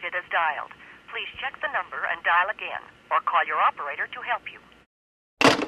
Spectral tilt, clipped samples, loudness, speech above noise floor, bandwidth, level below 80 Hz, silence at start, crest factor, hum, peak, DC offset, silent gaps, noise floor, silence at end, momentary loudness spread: -3 dB/octave; under 0.1%; -25 LUFS; over 63 dB; 15 kHz; -66 dBFS; 0 s; 24 dB; none; -2 dBFS; under 0.1%; 4.86-5.37 s; under -90 dBFS; 0 s; 14 LU